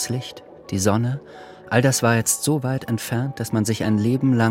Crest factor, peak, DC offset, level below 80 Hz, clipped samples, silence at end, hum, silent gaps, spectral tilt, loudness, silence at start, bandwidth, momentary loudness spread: 20 dB; -2 dBFS; under 0.1%; -56 dBFS; under 0.1%; 0 s; none; none; -5 dB/octave; -21 LUFS; 0 s; 16.5 kHz; 14 LU